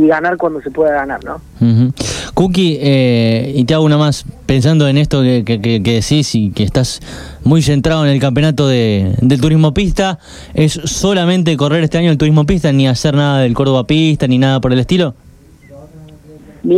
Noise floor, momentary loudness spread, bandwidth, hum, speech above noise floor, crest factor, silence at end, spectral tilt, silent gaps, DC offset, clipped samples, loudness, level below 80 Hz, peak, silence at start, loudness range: -40 dBFS; 7 LU; 13 kHz; none; 28 dB; 12 dB; 0 s; -6 dB/octave; none; under 0.1%; under 0.1%; -12 LUFS; -32 dBFS; 0 dBFS; 0 s; 2 LU